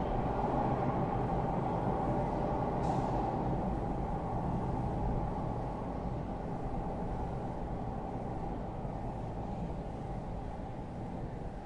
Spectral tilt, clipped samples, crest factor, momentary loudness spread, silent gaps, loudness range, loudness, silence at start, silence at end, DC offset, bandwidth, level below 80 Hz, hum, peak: -9 dB/octave; under 0.1%; 14 dB; 8 LU; none; 7 LU; -36 LUFS; 0 s; 0 s; under 0.1%; 10.5 kHz; -42 dBFS; none; -20 dBFS